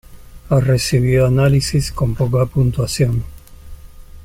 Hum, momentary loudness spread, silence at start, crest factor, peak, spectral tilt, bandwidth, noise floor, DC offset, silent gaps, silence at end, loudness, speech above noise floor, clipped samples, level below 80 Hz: none; 5 LU; 0.1 s; 14 dB; -2 dBFS; -6 dB/octave; 15.5 kHz; -36 dBFS; under 0.1%; none; 0 s; -16 LUFS; 21 dB; under 0.1%; -32 dBFS